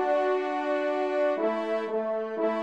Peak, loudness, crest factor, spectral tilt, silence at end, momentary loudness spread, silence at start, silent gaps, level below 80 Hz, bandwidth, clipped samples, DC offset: -14 dBFS; -28 LUFS; 12 dB; -5.5 dB/octave; 0 s; 4 LU; 0 s; none; -80 dBFS; 8.6 kHz; under 0.1%; under 0.1%